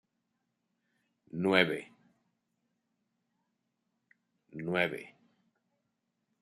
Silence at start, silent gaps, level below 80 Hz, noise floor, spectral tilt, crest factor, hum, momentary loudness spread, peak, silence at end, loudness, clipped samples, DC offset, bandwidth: 1.35 s; none; -78 dBFS; -82 dBFS; -6 dB/octave; 30 dB; none; 18 LU; -8 dBFS; 1.3 s; -31 LUFS; under 0.1%; under 0.1%; 13 kHz